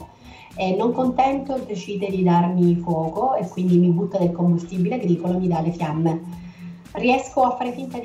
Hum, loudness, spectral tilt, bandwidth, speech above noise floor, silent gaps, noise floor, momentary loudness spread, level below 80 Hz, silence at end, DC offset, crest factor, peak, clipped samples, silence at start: none; -21 LUFS; -8 dB/octave; 7.8 kHz; 23 dB; none; -44 dBFS; 11 LU; -52 dBFS; 0 s; under 0.1%; 14 dB; -6 dBFS; under 0.1%; 0 s